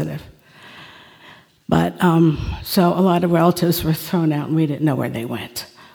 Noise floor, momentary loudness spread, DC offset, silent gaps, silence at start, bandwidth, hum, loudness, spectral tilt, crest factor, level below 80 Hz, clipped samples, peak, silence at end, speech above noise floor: -47 dBFS; 14 LU; under 0.1%; none; 0 s; over 20 kHz; none; -18 LUFS; -6.5 dB/octave; 18 dB; -42 dBFS; under 0.1%; -2 dBFS; 0.3 s; 29 dB